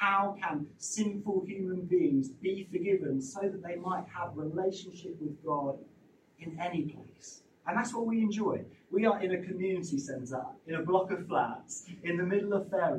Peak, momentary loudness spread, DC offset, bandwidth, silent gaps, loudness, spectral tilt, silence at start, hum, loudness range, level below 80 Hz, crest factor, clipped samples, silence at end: -14 dBFS; 12 LU; under 0.1%; 10.5 kHz; none; -33 LUFS; -5.5 dB/octave; 0 s; none; 5 LU; -74 dBFS; 20 dB; under 0.1%; 0 s